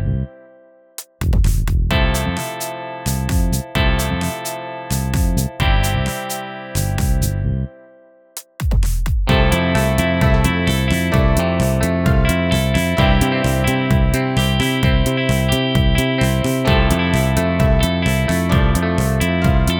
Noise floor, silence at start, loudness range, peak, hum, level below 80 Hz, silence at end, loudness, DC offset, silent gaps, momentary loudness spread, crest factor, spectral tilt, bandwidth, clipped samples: -48 dBFS; 0 s; 5 LU; 0 dBFS; none; -22 dBFS; 0 s; -18 LUFS; under 0.1%; none; 9 LU; 16 dB; -5.5 dB/octave; 20 kHz; under 0.1%